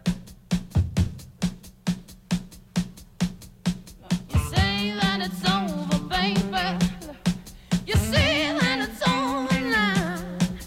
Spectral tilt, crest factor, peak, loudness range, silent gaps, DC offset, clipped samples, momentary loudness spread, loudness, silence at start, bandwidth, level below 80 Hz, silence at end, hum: -5 dB/octave; 16 dB; -10 dBFS; 6 LU; none; under 0.1%; under 0.1%; 9 LU; -25 LUFS; 0.05 s; 16 kHz; -38 dBFS; 0 s; none